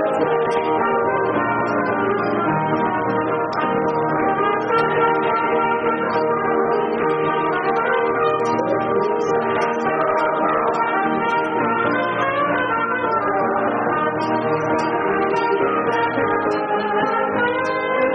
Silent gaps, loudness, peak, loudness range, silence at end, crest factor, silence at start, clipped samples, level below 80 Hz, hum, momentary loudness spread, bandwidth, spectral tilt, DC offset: none; -19 LUFS; -6 dBFS; 1 LU; 0 s; 14 dB; 0 s; under 0.1%; -56 dBFS; none; 2 LU; 6.6 kHz; -4 dB/octave; under 0.1%